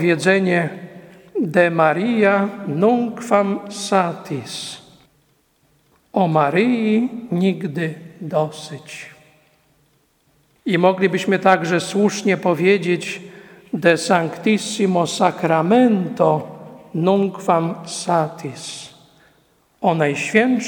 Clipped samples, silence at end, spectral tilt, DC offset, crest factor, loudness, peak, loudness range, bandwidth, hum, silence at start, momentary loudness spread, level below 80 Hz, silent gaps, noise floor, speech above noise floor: under 0.1%; 0 s; -5.5 dB/octave; under 0.1%; 20 dB; -18 LUFS; 0 dBFS; 5 LU; 18 kHz; none; 0 s; 15 LU; -66 dBFS; none; -61 dBFS; 43 dB